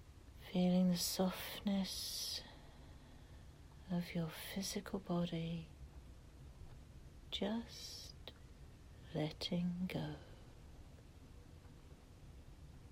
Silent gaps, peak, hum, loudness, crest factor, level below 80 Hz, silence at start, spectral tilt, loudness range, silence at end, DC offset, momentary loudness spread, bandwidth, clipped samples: none; -24 dBFS; none; -41 LUFS; 20 dB; -60 dBFS; 0 s; -5 dB/octave; 9 LU; 0 s; under 0.1%; 22 LU; 16 kHz; under 0.1%